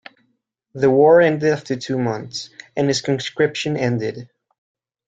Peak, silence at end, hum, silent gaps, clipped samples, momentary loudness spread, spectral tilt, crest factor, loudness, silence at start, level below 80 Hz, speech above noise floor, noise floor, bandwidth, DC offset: -2 dBFS; 0.8 s; none; none; under 0.1%; 17 LU; -5.5 dB/octave; 16 dB; -18 LUFS; 0.75 s; -60 dBFS; 51 dB; -69 dBFS; 9 kHz; under 0.1%